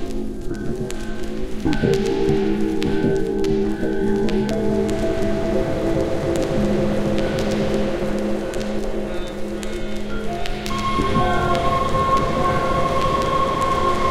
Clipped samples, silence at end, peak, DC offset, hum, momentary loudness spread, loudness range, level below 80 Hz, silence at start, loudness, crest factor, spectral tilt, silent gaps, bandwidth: under 0.1%; 0 s; -2 dBFS; 2%; none; 9 LU; 4 LU; -30 dBFS; 0 s; -22 LUFS; 18 dB; -6 dB/octave; none; 14.5 kHz